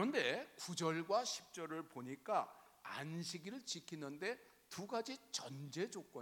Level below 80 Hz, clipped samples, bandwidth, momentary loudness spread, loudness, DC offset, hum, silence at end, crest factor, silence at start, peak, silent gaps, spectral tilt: -88 dBFS; under 0.1%; 19 kHz; 12 LU; -44 LUFS; under 0.1%; none; 0 s; 20 dB; 0 s; -24 dBFS; none; -3.5 dB/octave